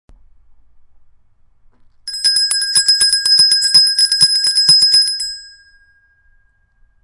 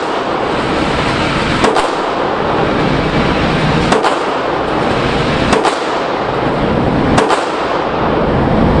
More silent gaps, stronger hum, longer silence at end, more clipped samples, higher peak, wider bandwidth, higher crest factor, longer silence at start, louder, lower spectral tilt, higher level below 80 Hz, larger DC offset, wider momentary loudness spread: neither; neither; first, 1.55 s vs 0 s; neither; about the same, 0 dBFS vs 0 dBFS; about the same, 11.5 kHz vs 11.5 kHz; about the same, 16 dB vs 14 dB; first, 2.05 s vs 0 s; first, -9 LUFS vs -13 LUFS; second, 2.5 dB/octave vs -5.5 dB/octave; second, -52 dBFS vs -28 dBFS; neither; first, 14 LU vs 4 LU